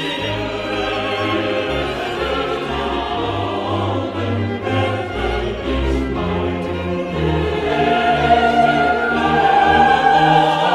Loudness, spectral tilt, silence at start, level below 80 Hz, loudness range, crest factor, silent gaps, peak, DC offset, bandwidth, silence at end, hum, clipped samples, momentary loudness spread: -17 LUFS; -6 dB/octave; 0 s; -32 dBFS; 6 LU; 16 dB; none; -2 dBFS; under 0.1%; 13 kHz; 0 s; none; under 0.1%; 9 LU